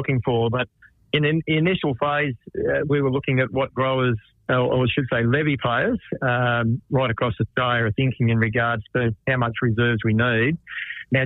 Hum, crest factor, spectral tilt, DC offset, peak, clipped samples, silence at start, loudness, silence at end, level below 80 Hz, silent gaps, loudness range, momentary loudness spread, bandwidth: none; 16 dB; -10 dB/octave; under 0.1%; -6 dBFS; under 0.1%; 0 s; -22 LUFS; 0 s; -50 dBFS; none; 1 LU; 4 LU; 4 kHz